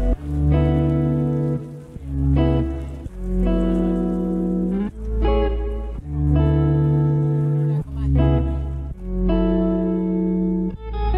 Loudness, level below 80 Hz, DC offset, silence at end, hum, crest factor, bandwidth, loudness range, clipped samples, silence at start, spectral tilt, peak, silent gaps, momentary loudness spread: -21 LUFS; -26 dBFS; under 0.1%; 0 s; none; 14 dB; 4.2 kHz; 2 LU; under 0.1%; 0 s; -10.5 dB/octave; -6 dBFS; none; 10 LU